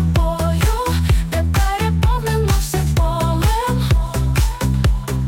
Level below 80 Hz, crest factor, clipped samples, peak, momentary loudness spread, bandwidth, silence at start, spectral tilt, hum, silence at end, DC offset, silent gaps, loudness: -20 dBFS; 10 dB; under 0.1%; -6 dBFS; 1 LU; 17 kHz; 0 s; -5.5 dB/octave; none; 0 s; under 0.1%; none; -18 LUFS